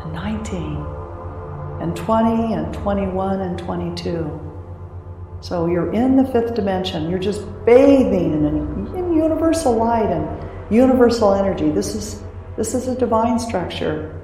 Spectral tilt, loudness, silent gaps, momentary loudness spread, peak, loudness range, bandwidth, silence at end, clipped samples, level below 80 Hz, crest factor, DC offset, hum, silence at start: -6.5 dB/octave; -19 LUFS; none; 17 LU; -2 dBFS; 6 LU; 15.5 kHz; 0 s; under 0.1%; -38 dBFS; 18 dB; under 0.1%; none; 0 s